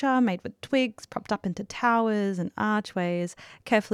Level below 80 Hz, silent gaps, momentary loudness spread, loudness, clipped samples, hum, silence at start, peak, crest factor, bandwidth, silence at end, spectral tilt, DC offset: -66 dBFS; none; 10 LU; -27 LUFS; under 0.1%; none; 0 s; -10 dBFS; 18 dB; 13.5 kHz; 0 s; -6 dB/octave; under 0.1%